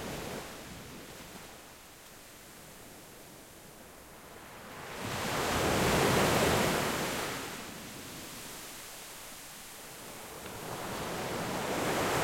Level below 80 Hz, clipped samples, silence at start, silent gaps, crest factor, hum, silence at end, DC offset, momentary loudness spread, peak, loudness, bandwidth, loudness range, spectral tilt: -54 dBFS; under 0.1%; 0 s; none; 20 dB; none; 0 s; under 0.1%; 23 LU; -16 dBFS; -33 LUFS; 16.5 kHz; 19 LU; -3.5 dB/octave